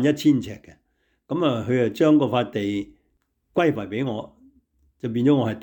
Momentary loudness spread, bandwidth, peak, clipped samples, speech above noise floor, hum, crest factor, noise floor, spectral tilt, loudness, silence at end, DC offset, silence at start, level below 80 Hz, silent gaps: 16 LU; 19 kHz; -8 dBFS; under 0.1%; 49 dB; none; 16 dB; -70 dBFS; -7 dB/octave; -22 LUFS; 0 s; under 0.1%; 0 s; -60 dBFS; none